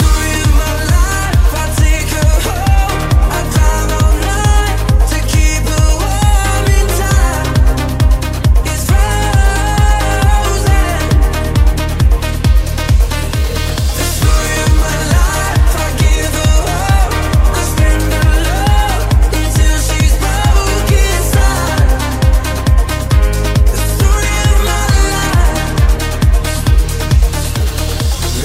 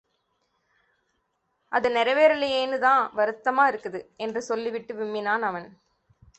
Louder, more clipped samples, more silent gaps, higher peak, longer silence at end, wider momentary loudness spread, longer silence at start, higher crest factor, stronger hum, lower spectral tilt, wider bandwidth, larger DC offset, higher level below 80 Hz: first, -13 LUFS vs -24 LUFS; neither; neither; first, 0 dBFS vs -6 dBFS; second, 0 s vs 0.7 s; second, 2 LU vs 12 LU; second, 0 s vs 1.7 s; second, 10 dB vs 20 dB; neither; about the same, -4.5 dB/octave vs -3.5 dB/octave; first, 16 kHz vs 8.4 kHz; neither; first, -12 dBFS vs -68 dBFS